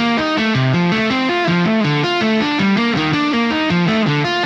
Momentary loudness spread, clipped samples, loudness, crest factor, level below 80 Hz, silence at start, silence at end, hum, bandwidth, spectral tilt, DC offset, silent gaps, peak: 1 LU; under 0.1%; -16 LUFS; 12 dB; -50 dBFS; 0 s; 0 s; none; 8.2 kHz; -6 dB/octave; under 0.1%; none; -4 dBFS